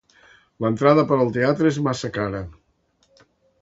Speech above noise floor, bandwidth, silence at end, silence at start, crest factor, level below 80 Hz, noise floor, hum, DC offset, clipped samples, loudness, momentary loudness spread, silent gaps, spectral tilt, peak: 45 dB; 8 kHz; 1.1 s; 0.6 s; 22 dB; -52 dBFS; -65 dBFS; none; under 0.1%; under 0.1%; -20 LUFS; 11 LU; none; -7 dB/octave; -2 dBFS